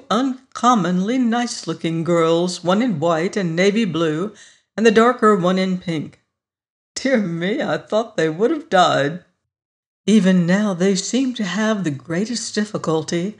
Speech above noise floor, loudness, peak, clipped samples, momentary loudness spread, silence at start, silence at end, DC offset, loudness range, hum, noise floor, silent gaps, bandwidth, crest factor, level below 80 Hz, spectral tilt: 60 dB; -19 LUFS; -2 dBFS; under 0.1%; 9 LU; 0.1 s; 0.05 s; under 0.1%; 2 LU; none; -78 dBFS; 6.70-6.95 s, 9.65-10.04 s; 11 kHz; 16 dB; -64 dBFS; -5.5 dB/octave